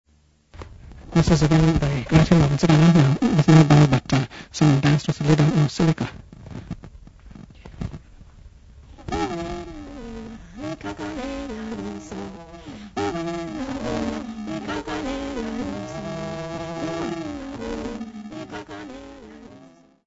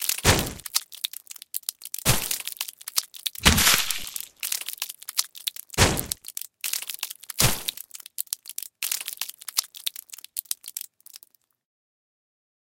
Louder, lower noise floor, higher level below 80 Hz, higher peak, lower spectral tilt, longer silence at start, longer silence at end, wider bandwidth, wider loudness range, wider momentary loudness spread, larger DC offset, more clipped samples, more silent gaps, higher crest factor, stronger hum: first, -21 LUFS vs -26 LUFS; about the same, -58 dBFS vs -58 dBFS; about the same, -40 dBFS vs -40 dBFS; about the same, -2 dBFS vs 0 dBFS; first, -7 dB/octave vs -2 dB/octave; first, 0.55 s vs 0 s; second, 0.5 s vs 1.5 s; second, 8 kHz vs 17 kHz; first, 17 LU vs 8 LU; first, 22 LU vs 14 LU; neither; neither; neither; second, 22 dB vs 28 dB; neither